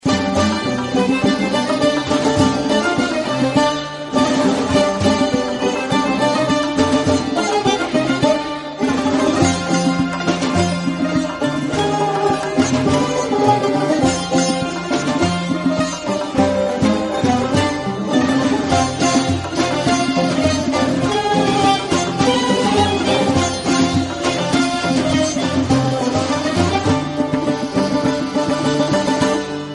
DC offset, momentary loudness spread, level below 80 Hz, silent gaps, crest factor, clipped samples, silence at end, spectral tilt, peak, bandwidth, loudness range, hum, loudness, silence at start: under 0.1%; 4 LU; -44 dBFS; none; 16 dB; under 0.1%; 0 s; -5 dB/octave; -2 dBFS; 11.5 kHz; 2 LU; none; -17 LUFS; 0.05 s